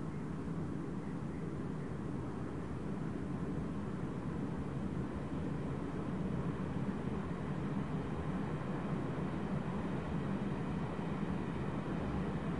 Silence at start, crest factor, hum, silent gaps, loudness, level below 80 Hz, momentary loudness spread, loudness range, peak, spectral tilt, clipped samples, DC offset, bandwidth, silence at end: 0 s; 14 dB; none; none; -40 LUFS; -54 dBFS; 3 LU; 2 LU; -26 dBFS; -8.5 dB/octave; under 0.1%; 0.3%; 11.5 kHz; 0 s